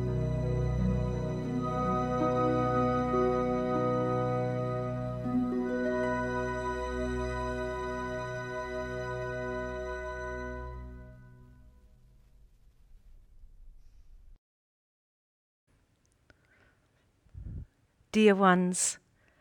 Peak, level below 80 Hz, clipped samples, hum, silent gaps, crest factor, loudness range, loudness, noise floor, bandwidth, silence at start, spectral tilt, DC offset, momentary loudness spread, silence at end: -12 dBFS; -46 dBFS; under 0.1%; none; 14.38-15.67 s; 22 dB; 15 LU; -31 LUFS; -70 dBFS; 16 kHz; 0 s; -5.5 dB/octave; under 0.1%; 13 LU; 0.45 s